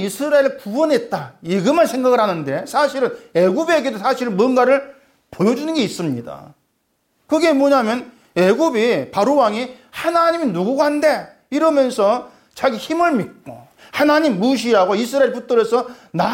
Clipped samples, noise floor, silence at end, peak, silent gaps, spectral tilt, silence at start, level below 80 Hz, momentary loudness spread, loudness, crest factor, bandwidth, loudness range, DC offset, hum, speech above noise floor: under 0.1%; -67 dBFS; 0 s; -4 dBFS; none; -5.5 dB/octave; 0 s; -62 dBFS; 9 LU; -17 LUFS; 14 dB; 17 kHz; 3 LU; under 0.1%; none; 50 dB